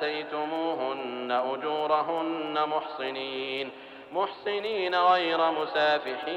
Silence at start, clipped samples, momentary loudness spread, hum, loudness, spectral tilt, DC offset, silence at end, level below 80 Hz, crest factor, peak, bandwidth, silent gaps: 0 s; under 0.1%; 9 LU; none; -28 LUFS; -5 dB/octave; under 0.1%; 0 s; -74 dBFS; 16 dB; -12 dBFS; 8.2 kHz; none